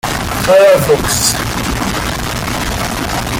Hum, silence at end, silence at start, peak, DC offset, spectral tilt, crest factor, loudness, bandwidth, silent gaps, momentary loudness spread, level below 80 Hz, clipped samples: none; 0 s; 0.05 s; 0 dBFS; under 0.1%; -3.5 dB/octave; 14 dB; -13 LUFS; 17 kHz; none; 10 LU; -28 dBFS; under 0.1%